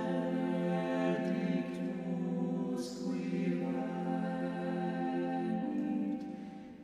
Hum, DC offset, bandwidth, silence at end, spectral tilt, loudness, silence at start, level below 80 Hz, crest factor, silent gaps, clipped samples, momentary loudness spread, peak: none; under 0.1%; 10.5 kHz; 0 s; -7.5 dB/octave; -36 LUFS; 0 s; -74 dBFS; 14 dB; none; under 0.1%; 5 LU; -20 dBFS